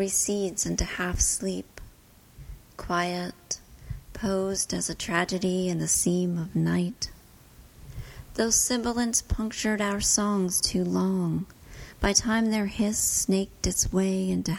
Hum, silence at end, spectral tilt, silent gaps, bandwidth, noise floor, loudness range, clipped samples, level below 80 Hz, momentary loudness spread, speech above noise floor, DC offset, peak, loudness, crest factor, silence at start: none; 0 s; -3.5 dB/octave; none; 17 kHz; -54 dBFS; 5 LU; under 0.1%; -42 dBFS; 15 LU; 28 dB; under 0.1%; -6 dBFS; -26 LUFS; 20 dB; 0 s